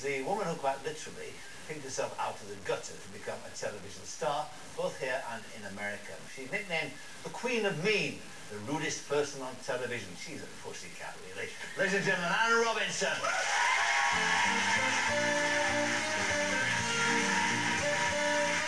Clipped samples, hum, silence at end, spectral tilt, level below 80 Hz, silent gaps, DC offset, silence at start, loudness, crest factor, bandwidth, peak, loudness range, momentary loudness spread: under 0.1%; none; 0 s; -2.5 dB/octave; -66 dBFS; none; 0.4%; 0 s; -31 LUFS; 16 dB; 11 kHz; -16 dBFS; 10 LU; 16 LU